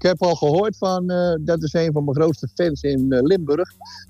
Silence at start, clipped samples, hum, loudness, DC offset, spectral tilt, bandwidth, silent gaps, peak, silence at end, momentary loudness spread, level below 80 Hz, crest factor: 0 s; under 0.1%; none; -20 LUFS; under 0.1%; -7 dB/octave; 14.5 kHz; none; -6 dBFS; 0.05 s; 5 LU; -46 dBFS; 14 dB